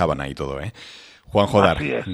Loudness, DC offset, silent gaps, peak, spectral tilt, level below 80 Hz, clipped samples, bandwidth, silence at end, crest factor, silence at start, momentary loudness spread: -21 LUFS; under 0.1%; none; 0 dBFS; -6.5 dB/octave; -42 dBFS; under 0.1%; 13 kHz; 0 s; 20 dB; 0 s; 20 LU